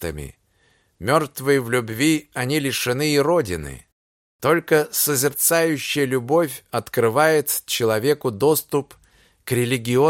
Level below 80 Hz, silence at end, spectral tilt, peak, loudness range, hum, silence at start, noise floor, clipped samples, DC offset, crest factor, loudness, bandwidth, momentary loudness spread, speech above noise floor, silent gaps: -50 dBFS; 0 s; -4 dB/octave; -4 dBFS; 2 LU; none; 0 s; -62 dBFS; under 0.1%; under 0.1%; 18 dB; -20 LUFS; 17 kHz; 9 LU; 42 dB; 3.92-4.39 s